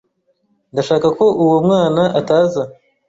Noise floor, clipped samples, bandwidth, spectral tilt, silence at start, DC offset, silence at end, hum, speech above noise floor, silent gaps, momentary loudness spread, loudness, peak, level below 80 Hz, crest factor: -63 dBFS; under 0.1%; 7.8 kHz; -7 dB/octave; 0.75 s; under 0.1%; 0.35 s; none; 49 dB; none; 11 LU; -15 LUFS; -2 dBFS; -54 dBFS; 14 dB